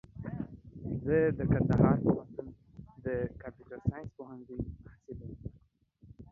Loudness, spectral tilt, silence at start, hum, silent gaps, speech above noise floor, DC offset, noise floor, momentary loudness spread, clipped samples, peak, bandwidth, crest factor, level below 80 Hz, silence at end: -32 LUFS; -11.5 dB/octave; 0.15 s; none; none; 33 dB; under 0.1%; -65 dBFS; 22 LU; under 0.1%; -12 dBFS; 6.6 kHz; 22 dB; -50 dBFS; 0.05 s